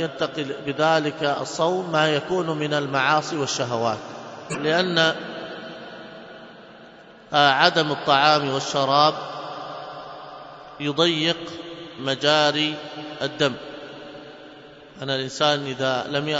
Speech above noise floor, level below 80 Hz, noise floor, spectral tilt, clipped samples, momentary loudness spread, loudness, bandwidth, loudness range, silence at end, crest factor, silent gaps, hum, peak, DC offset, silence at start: 24 dB; -66 dBFS; -46 dBFS; -4 dB/octave; under 0.1%; 20 LU; -22 LUFS; 8.8 kHz; 6 LU; 0 s; 22 dB; none; none; 0 dBFS; under 0.1%; 0 s